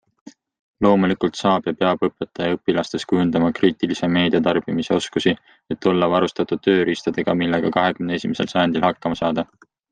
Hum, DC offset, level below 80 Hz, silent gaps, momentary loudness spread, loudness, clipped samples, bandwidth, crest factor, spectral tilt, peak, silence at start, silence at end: none; under 0.1%; -56 dBFS; 0.59-0.74 s; 5 LU; -20 LUFS; under 0.1%; 9.2 kHz; 18 dB; -6 dB/octave; -2 dBFS; 0.25 s; 0.45 s